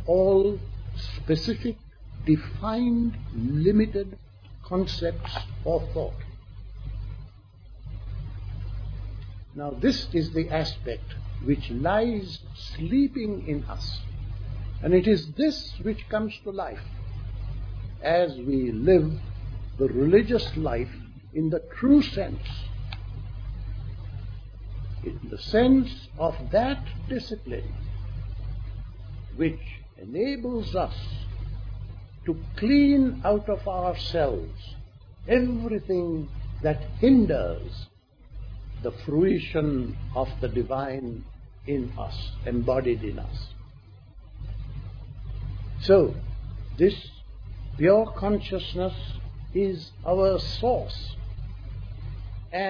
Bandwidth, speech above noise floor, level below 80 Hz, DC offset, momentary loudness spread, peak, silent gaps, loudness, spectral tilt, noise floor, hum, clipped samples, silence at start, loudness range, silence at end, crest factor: 5.4 kHz; 23 dB; -38 dBFS; under 0.1%; 19 LU; -6 dBFS; none; -27 LUFS; -8 dB/octave; -48 dBFS; none; under 0.1%; 0 s; 7 LU; 0 s; 20 dB